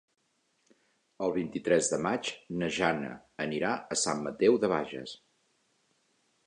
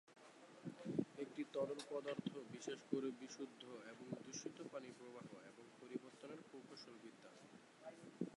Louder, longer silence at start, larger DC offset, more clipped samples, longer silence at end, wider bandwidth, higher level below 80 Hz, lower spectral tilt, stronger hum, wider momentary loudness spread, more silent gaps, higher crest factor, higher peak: first, -30 LUFS vs -51 LUFS; first, 1.2 s vs 0.05 s; neither; neither; first, 1.3 s vs 0.05 s; about the same, 11 kHz vs 11.5 kHz; first, -66 dBFS vs under -90 dBFS; about the same, -4 dB/octave vs -5 dB/octave; neither; second, 12 LU vs 16 LU; neither; about the same, 22 dB vs 24 dB; first, -10 dBFS vs -26 dBFS